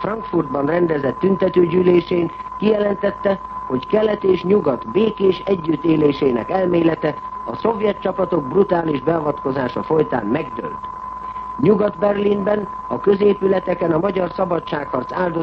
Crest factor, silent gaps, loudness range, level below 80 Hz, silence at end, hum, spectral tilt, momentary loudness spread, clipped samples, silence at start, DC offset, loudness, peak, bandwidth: 16 dB; none; 2 LU; -48 dBFS; 0 s; none; -9 dB/octave; 9 LU; under 0.1%; 0 s; under 0.1%; -19 LUFS; -2 dBFS; 6 kHz